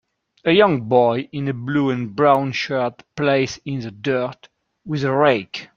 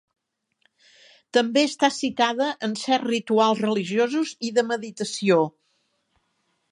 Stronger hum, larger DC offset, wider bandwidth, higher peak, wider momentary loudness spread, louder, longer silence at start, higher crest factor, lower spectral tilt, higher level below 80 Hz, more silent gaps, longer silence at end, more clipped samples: neither; neither; second, 7.4 kHz vs 11.5 kHz; first, -2 dBFS vs -6 dBFS; first, 10 LU vs 7 LU; first, -20 LUFS vs -23 LUFS; second, 0.45 s vs 1.35 s; about the same, 18 dB vs 20 dB; first, -6.5 dB/octave vs -4 dB/octave; first, -58 dBFS vs -74 dBFS; neither; second, 0.1 s vs 1.2 s; neither